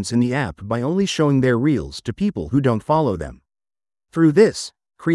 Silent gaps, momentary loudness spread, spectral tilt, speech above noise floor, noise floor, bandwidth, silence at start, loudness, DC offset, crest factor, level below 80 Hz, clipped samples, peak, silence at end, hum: none; 13 LU; -6.5 dB/octave; over 71 dB; under -90 dBFS; 12 kHz; 0 s; -19 LUFS; under 0.1%; 18 dB; -46 dBFS; under 0.1%; -2 dBFS; 0 s; none